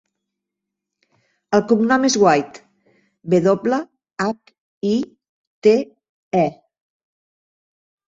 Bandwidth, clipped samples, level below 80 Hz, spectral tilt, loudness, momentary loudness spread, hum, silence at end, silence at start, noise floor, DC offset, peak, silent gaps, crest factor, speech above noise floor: 7.8 kHz; under 0.1%; -62 dBFS; -5 dB/octave; -18 LUFS; 18 LU; none; 1.6 s; 1.5 s; -82 dBFS; under 0.1%; -2 dBFS; 4.60-4.81 s, 5.29-5.62 s, 6.09-6.31 s; 20 dB; 66 dB